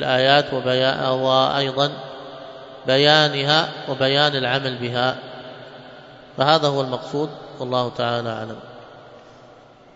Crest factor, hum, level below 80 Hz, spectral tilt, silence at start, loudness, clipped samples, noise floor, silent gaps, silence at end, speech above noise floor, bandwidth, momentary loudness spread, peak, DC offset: 22 dB; none; -62 dBFS; -5 dB/octave; 0 s; -19 LUFS; under 0.1%; -47 dBFS; none; 0.8 s; 27 dB; 8 kHz; 22 LU; 0 dBFS; under 0.1%